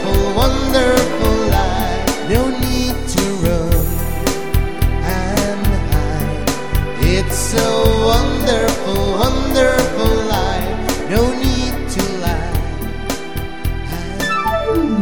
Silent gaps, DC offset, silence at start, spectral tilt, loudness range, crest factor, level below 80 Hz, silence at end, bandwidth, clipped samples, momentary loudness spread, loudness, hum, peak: none; 5%; 0 s; -5 dB/octave; 4 LU; 16 dB; -22 dBFS; 0 s; 17.5 kHz; under 0.1%; 7 LU; -17 LUFS; none; 0 dBFS